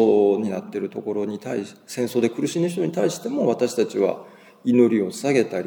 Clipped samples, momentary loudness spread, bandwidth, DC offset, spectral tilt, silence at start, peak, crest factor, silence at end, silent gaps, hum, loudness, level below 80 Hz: under 0.1%; 11 LU; 19.5 kHz; under 0.1%; -6 dB/octave; 0 s; -4 dBFS; 18 dB; 0 s; none; none; -22 LUFS; -76 dBFS